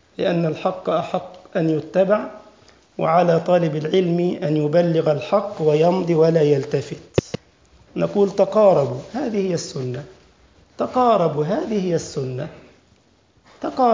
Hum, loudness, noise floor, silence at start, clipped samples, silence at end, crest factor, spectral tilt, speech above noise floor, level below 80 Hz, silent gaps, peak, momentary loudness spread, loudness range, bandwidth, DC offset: none; -20 LUFS; -57 dBFS; 0.2 s; under 0.1%; 0 s; 18 dB; -7 dB/octave; 39 dB; -54 dBFS; none; -2 dBFS; 12 LU; 4 LU; 7.6 kHz; under 0.1%